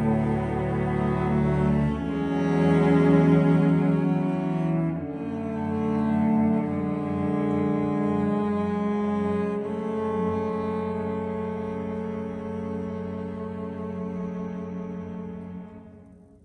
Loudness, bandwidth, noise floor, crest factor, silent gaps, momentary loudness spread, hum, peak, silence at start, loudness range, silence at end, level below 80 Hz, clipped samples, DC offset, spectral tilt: -26 LUFS; 9.4 kHz; -50 dBFS; 18 dB; none; 13 LU; none; -8 dBFS; 0 s; 11 LU; 0.3 s; -46 dBFS; under 0.1%; under 0.1%; -9.5 dB/octave